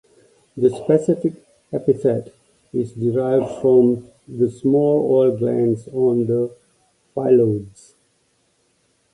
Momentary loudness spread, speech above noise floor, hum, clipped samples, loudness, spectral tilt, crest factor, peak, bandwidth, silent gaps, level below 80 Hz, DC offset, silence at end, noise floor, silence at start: 12 LU; 46 dB; none; under 0.1%; -19 LUFS; -9.5 dB/octave; 16 dB; -2 dBFS; 11 kHz; none; -58 dBFS; under 0.1%; 1.45 s; -64 dBFS; 0.55 s